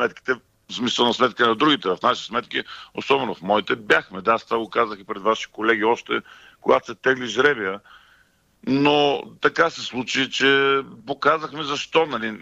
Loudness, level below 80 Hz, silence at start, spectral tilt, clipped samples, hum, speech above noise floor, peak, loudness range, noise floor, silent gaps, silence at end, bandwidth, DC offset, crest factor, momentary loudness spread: -21 LUFS; -62 dBFS; 0 s; -4 dB/octave; under 0.1%; none; 38 dB; -4 dBFS; 2 LU; -60 dBFS; none; 0 s; 8.4 kHz; under 0.1%; 18 dB; 10 LU